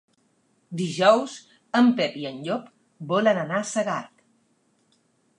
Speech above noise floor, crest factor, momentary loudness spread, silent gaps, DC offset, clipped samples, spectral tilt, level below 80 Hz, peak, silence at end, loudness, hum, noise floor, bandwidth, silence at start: 44 dB; 22 dB; 16 LU; none; under 0.1%; under 0.1%; -5 dB/octave; -78 dBFS; -4 dBFS; 1.35 s; -24 LUFS; none; -67 dBFS; 10.5 kHz; 0.7 s